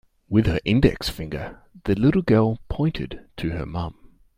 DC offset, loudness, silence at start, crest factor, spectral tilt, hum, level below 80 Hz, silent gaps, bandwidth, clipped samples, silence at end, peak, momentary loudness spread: under 0.1%; -23 LUFS; 0.3 s; 20 dB; -7.5 dB/octave; none; -38 dBFS; none; 16 kHz; under 0.1%; 0.45 s; -2 dBFS; 14 LU